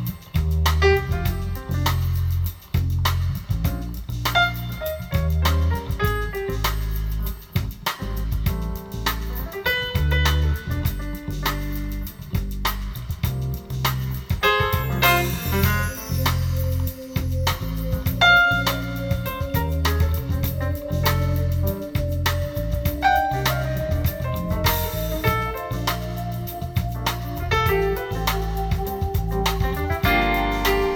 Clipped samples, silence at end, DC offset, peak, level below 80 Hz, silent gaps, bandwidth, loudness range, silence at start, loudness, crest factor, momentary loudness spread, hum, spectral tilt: under 0.1%; 0 s; under 0.1%; -4 dBFS; -30 dBFS; none; over 20 kHz; 5 LU; 0 s; -23 LUFS; 18 dB; 9 LU; none; -5 dB/octave